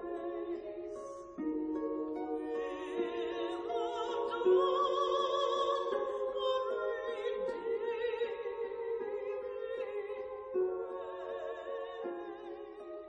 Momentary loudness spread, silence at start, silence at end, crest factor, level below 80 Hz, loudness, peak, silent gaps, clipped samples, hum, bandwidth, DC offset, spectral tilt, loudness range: 11 LU; 0 s; 0 s; 18 dB; -70 dBFS; -36 LUFS; -18 dBFS; none; under 0.1%; none; 9.2 kHz; under 0.1%; -4.5 dB/octave; 7 LU